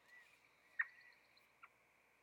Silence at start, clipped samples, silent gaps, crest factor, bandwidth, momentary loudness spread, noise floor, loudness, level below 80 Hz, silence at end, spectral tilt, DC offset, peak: 0.1 s; under 0.1%; none; 26 dB; 17 kHz; 23 LU; -75 dBFS; -46 LUFS; under -90 dBFS; 0.55 s; -1 dB/octave; under 0.1%; -28 dBFS